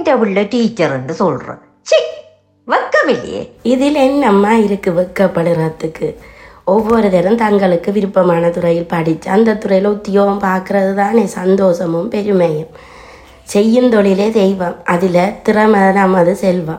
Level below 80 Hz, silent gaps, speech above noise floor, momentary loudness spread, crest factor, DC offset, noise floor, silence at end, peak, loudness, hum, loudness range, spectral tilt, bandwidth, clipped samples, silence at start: -46 dBFS; none; 28 dB; 8 LU; 12 dB; under 0.1%; -40 dBFS; 0 s; 0 dBFS; -13 LUFS; none; 3 LU; -6.5 dB/octave; 16 kHz; under 0.1%; 0 s